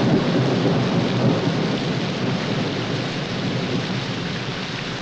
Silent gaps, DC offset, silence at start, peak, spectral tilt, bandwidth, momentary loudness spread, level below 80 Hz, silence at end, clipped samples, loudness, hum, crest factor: none; under 0.1%; 0 s; -6 dBFS; -6 dB/octave; 8.8 kHz; 6 LU; -48 dBFS; 0 s; under 0.1%; -22 LUFS; none; 16 dB